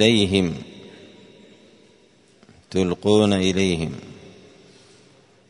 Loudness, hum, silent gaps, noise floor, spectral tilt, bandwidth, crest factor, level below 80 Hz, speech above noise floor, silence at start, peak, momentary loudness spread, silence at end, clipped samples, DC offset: -20 LUFS; none; none; -55 dBFS; -5.5 dB/octave; 10.5 kHz; 22 dB; -52 dBFS; 36 dB; 0 s; 0 dBFS; 25 LU; 1.35 s; under 0.1%; under 0.1%